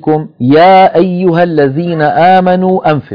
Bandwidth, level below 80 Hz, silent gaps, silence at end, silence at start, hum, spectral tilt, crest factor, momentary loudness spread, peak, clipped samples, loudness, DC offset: 5.4 kHz; -48 dBFS; none; 0 s; 0.05 s; none; -9.5 dB/octave; 8 dB; 7 LU; 0 dBFS; 0.8%; -8 LUFS; under 0.1%